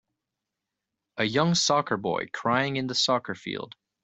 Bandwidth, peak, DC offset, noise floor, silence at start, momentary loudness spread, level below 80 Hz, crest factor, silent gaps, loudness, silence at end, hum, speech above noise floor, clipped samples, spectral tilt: 8.2 kHz; -8 dBFS; under 0.1%; -86 dBFS; 1.15 s; 13 LU; -66 dBFS; 20 dB; none; -26 LUFS; 0.35 s; none; 60 dB; under 0.1%; -3.5 dB/octave